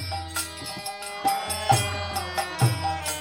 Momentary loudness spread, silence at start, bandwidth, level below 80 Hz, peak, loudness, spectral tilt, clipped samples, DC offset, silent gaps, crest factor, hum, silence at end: 10 LU; 0 s; 17 kHz; -48 dBFS; -6 dBFS; -26 LUFS; -3.5 dB/octave; under 0.1%; under 0.1%; none; 20 dB; none; 0 s